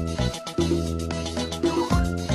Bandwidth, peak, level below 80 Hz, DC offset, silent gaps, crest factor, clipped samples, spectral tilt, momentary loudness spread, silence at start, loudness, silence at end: 14 kHz; -8 dBFS; -32 dBFS; under 0.1%; none; 18 dB; under 0.1%; -5.5 dB/octave; 5 LU; 0 s; -26 LUFS; 0 s